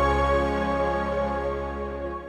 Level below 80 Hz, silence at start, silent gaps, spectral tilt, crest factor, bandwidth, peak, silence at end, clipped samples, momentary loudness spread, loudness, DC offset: -34 dBFS; 0 s; none; -7 dB/octave; 14 dB; 10.5 kHz; -10 dBFS; 0 s; under 0.1%; 9 LU; -26 LUFS; under 0.1%